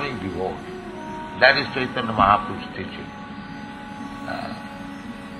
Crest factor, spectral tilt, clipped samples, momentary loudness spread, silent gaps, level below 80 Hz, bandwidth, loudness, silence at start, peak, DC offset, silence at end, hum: 24 dB; -5.5 dB/octave; under 0.1%; 19 LU; none; -48 dBFS; 12.5 kHz; -22 LUFS; 0 s; -2 dBFS; under 0.1%; 0 s; none